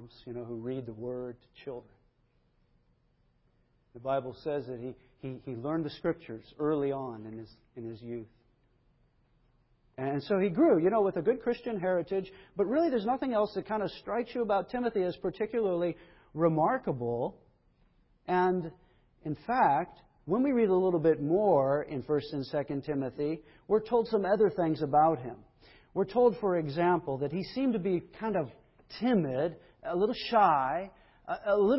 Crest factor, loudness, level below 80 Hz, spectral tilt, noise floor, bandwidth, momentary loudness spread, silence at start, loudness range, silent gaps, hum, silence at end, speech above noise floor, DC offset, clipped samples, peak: 20 dB; -30 LUFS; -64 dBFS; -10.5 dB/octave; -70 dBFS; 5.8 kHz; 18 LU; 0 s; 11 LU; none; none; 0 s; 40 dB; under 0.1%; under 0.1%; -12 dBFS